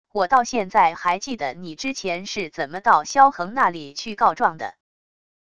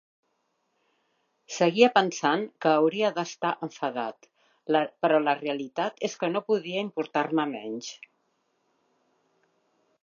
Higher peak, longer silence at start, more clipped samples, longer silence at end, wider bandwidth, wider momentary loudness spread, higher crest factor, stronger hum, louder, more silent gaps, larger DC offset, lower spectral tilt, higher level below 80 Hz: first, -2 dBFS vs -6 dBFS; second, 0.15 s vs 1.5 s; neither; second, 0.75 s vs 2.1 s; first, 10.5 kHz vs 7.4 kHz; about the same, 12 LU vs 14 LU; about the same, 20 dB vs 24 dB; neither; first, -21 LUFS vs -26 LUFS; neither; first, 0.4% vs under 0.1%; second, -3 dB/octave vs -4.5 dB/octave; first, -58 dBFS vs -84 dBFS